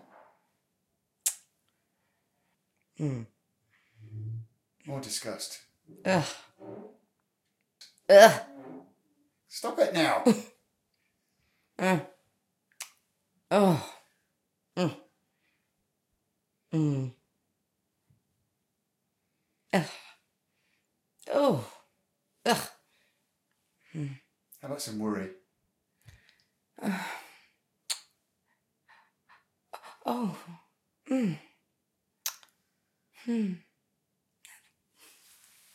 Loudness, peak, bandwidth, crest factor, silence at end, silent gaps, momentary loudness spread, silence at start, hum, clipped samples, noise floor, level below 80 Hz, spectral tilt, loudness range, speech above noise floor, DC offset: -28 LUFS; -2 dBFS; 16.5 kHz; 30 dB; 2.15 s; none; 23 LU; 1.25 s; none; under 0.1%; -81 dBFS; -78 dBFS; -4.5 dB/octave; 16 LU; 54 dB; under 0.1%